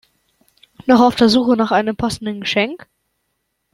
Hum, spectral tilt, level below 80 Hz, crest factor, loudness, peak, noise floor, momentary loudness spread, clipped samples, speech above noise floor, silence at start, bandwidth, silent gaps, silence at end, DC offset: none; -5 dB/octave; -48 dBFS; 16 dB; -16 LUFS; -2 dBFS; -71 dBFS; 11 LU; under 0.1%; 56 dB; 0.85 s; 13 kHz; none; 0.95 s; under 0.1%